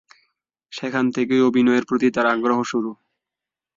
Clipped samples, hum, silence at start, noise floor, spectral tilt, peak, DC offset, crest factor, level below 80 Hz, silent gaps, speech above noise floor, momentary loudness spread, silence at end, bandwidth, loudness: under 0.1%; none; 0.7 s; -87 dBFS; -5.5 dB/octave; -6 dBFS; under 0.1%; 16 dB; -66 dBFS; none; 68 dB; 12 LU; 0.85 s; 7.6 kHz; -20 LUFS